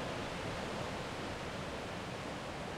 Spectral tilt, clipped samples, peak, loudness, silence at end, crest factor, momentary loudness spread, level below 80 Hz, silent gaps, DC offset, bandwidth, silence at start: -4.5 dB/octave; under 0.1%; -28 dBFS; -41 LUFS; 0 s; 14 dB; 2 LU; -56 dBFS; none; under 0.1%; 16 kHz; 0 s